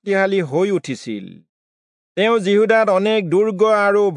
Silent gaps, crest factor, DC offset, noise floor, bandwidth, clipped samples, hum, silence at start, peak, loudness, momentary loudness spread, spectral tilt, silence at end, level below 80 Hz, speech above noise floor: 1.49-2.15 s; 16 dB; under 0.1%; under -90 dBFS; 10.5 kHz; under 0.1%; none; 0.05 s; -2 dBFS; -16 LUFS; 13 LU; -6 dB/octave; 0 s; -76 dBFS; over 74 dB